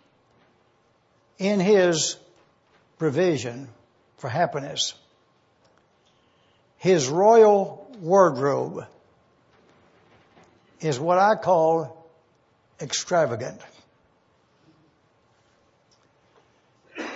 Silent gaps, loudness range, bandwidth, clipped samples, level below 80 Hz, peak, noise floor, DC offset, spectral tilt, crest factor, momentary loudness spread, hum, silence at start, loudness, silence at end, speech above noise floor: none; 10 LU; 8 kHz; under 0.1%; -72 dBFS; -4 dBFS; -64 dBFS; under 0.1%; -4.5 dB/octave; 22 dB; 19 LU; none; 1.4 s; -22 LUFS; 0 s; 43 dB